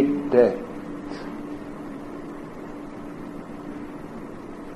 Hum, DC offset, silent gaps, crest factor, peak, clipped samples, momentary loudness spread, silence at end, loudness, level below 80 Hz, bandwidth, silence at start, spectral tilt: none; under 0.1%; none; 24 dB; -4 dBFS; under 0.1%; 18 LU; 0 s; -29 LUFS; -54 dBFS; 12.5 kHz; 0 s; -7.5 dB/octave